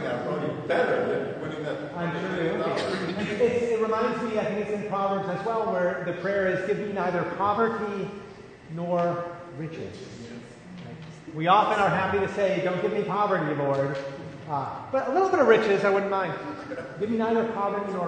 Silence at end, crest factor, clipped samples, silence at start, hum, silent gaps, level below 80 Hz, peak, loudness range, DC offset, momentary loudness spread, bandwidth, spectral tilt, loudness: 0 s; 22 dB; under 0.1%; 0 s; none; none; -62 dBFS; -4 dBFS; 4 LU; under 0.1%; 16 LU; 9.6 kHz; -6.5 dB/octave; -26 LUFS